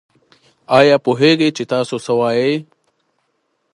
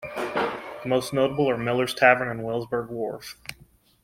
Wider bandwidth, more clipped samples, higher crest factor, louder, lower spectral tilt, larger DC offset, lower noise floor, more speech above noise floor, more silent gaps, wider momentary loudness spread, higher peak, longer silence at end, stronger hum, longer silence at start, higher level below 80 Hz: second, 11.5 kHz vs 16.5 kHz; neither; second, 16 dB vs 22 dB; first, -15 LUFS vs -24 LUFS; about the same, -5.5 dB/octave vs -5 dB/octave; neither; first, -67 dBFS vs -56 dBFS; first, 53 dB vs 32 dB; neither; second, 8 LU vs 17 LU; first, 0 dBFS vs -4 dBFS; first, 1.1 s vs 0.5 s; neither; first, 0.7 s vs 0 s; second, -64 dBFS vs -58 dBFS